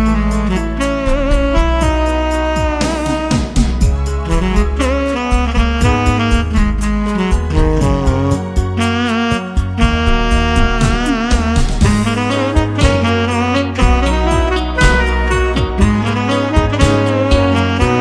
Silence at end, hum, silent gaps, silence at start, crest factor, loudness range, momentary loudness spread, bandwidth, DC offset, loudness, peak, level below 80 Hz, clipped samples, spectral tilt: 0 s; none; none; 0 s; 12 dB; 2 LU; 4 LU; 11 kHz; under 0.1%; -15 LUFS; 0 dBFS; -16 dBFS; under 0.1%; -6 dB/octave